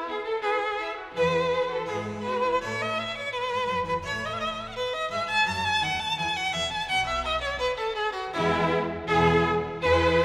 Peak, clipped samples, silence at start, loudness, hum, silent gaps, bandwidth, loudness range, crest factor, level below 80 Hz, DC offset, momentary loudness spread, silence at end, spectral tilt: -10 dBFS; under 0.1%; 0 s; -26 LUFS; none; none; 13.5 kHz; 3 LU; 18 dB; -46 dBFS; under 0.1%; 7 LU; 0 s; -4.5 dB/octave